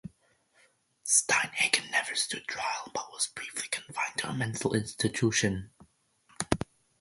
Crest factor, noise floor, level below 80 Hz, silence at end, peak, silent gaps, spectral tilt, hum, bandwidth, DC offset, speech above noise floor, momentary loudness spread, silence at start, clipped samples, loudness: 28 dB; -68 dBFS; -56 dBFS; 0.45 s; -4 dBFS; none; -2.5 dB/octave; none; 12 kHz; under 0.1%; 37 dB; 12 LU; 0.05 s; under 0.1%; -29 LUFS